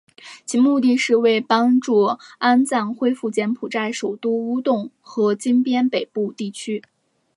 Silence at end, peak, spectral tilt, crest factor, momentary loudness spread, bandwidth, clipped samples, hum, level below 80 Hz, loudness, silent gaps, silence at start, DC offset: 0.55 s; -2 dBFS; -4.5 dB/octave; 16 dB; 10 LU; 11.5 kHz; under 0.1%; none; -76 dBFS; -20 LUFS; none; 0.25 s; under 0.1%